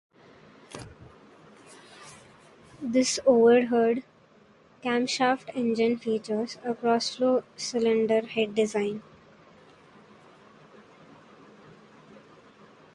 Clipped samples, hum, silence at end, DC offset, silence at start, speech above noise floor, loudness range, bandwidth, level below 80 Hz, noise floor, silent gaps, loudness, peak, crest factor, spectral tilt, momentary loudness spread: under 0.1%; none; 3.95 s; under 0.1%; 0.7 s; 33 dB; 9 LU; 11.5 kHz; -68 dBFS; -58 dBFS; none; -26 LUFS; -8 dBFS; 20 dB; -4 dB/octave; 23 LU